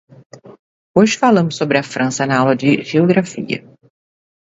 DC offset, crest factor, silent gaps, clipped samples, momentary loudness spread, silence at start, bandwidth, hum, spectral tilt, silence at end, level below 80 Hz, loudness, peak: under 0.1%; 16 dB; 0.59-0.94 s; under 0.1%; 10 LU; 0.45 s; 8 kHz; none; -5.5 dB/octave; 1 s; -58 dBFS; -15 LUFS; 0 dBFS